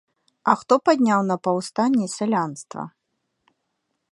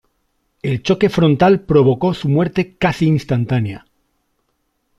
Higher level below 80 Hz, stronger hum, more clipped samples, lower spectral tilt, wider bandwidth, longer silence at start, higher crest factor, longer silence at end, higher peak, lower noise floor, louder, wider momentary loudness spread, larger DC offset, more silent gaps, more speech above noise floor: second, -72 dBFS vs -46 dBFS; neither; neither; second, -5.5 dB/octave vs -7.5 dB/octave; about the same, 11.5 kHz vs 12 kHz; second, 0.45 s vs 0.65 s; first, 22 dB vs 14 dB; about the same, 1.25 s vs 1.2 s; about the same, 0 dBFS vs -2 dBFS; first, -76 dBFS vs -68 dBFS; second, -21 LUFS vs -16 LUFS; first, 16 LU vs 10 LU; neither; neither; about the same, 55 dB vs 53 dB